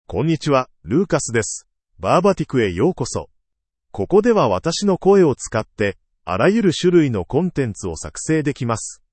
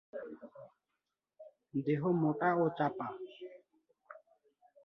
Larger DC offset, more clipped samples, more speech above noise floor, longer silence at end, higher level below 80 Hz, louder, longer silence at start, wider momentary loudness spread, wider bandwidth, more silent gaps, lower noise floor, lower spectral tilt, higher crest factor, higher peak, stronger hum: neither; neither; first, 59 dB vs 55 dB; second, 0.2 s vs 0.65 s; first, -46 dBFS vs -80 dBFS; first, -19 LUFS vs -34 LUFS; about the same, 0.1 s vs 0.15 s; second, 12 LU vs 25 LU; first, 8.8 kHz vs 5.8 kHz; neither; second, -77 dBFS vs -88 dBFS; second, -5.5 dB/octave vs -10 dB/octave; about the same, 16 dB vs 20 dB; first, -2 dBFS vs -18 dBFS; neither